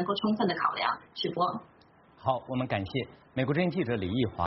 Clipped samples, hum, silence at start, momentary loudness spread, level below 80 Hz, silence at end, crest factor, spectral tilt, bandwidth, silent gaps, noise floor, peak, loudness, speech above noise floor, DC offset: under 0.1%; none; 0 s; 7 LU; -60 dBFS; 0 s; 16 dB; -4.5 dB/octave; 5.8 kHz; none; -58 dBFS; -14 dBFS; -30 LUFS; 28 dB; under 0.1%